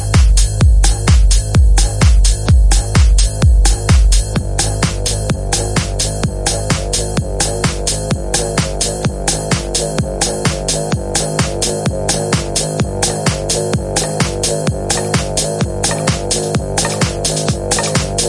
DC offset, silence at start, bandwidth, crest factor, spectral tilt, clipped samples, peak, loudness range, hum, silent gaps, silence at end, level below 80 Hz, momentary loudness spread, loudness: under 0.1%; 0 s; 11.5 kHz; 14 dB; -4 dB/octave; under 0.1%; 0 dBFS; 4 LU; none; none; 0 s; -16 dBFS; 5 LU; -15 LUFS